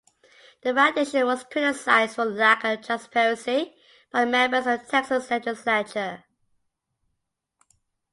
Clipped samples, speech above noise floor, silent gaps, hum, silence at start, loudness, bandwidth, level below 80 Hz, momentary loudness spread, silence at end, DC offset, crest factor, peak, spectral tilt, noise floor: under 0.1%; 56 dB; none; none; 0.65 s; -23 LUFS; 11.5 kHz; -72 dBFS; 9 LU; 1.95 s; under 0.1%; 20 dB; -6 dBFS; -3 dB/octave; -80 dBFS